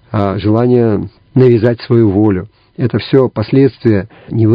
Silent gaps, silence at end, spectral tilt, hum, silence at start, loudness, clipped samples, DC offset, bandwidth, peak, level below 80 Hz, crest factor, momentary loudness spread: none; 0 s; -11 dB/octave; none; 0.1 s; -12 LUFS; 0.4%; under 0.1%; 5.2 kHz; 0 dBFS; -38 dBFS; 12 dB; 9 LU